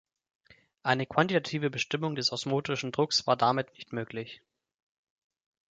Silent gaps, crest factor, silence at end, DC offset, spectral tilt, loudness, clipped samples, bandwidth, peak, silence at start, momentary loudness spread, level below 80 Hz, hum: none; 24 dB; 1.35 s; under 0.1%; -4.5 dB/octave; -29 LUFS; under 0.1%; 9.4 kHz; -8 dBFS; 0.85 s; 12 LU; -70 dBFS; none